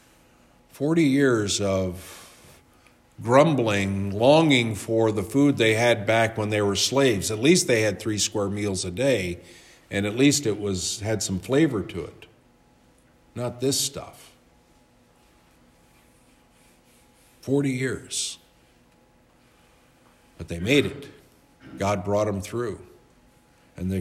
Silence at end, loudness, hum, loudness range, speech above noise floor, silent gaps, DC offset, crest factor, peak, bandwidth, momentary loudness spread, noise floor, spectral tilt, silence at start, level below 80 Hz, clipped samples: 0 s; -23 LUFS; none; 11 LU; 36 dB; none; under 0.1%; 22 dB; -4 dBFS; 15.5 kHz; 16 LU; -59 dBFS; -4.5 dB/octave; 0.75 s; -60 dBFS; under 0.1%